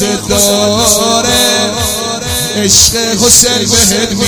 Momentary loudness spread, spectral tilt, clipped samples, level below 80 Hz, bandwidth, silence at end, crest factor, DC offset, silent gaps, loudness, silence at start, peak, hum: 8 LU; -2 dB/octave; 2%; -30 dBFS; over 20 kHz; 0 s; 10 dB; under 0.1%; none; -8 LUFS; 0 s; 0 dBFS; none